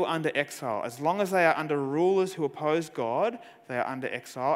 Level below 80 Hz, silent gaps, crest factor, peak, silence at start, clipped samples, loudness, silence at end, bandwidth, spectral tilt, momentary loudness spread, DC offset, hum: -78 dBFS; none; 20 dB; -8 dBFS; 0 s; under 0.1%; -28 LUFS; 0 s; 16 kHz; -5.5 dB/octave; 9 LU; under 0.1%; none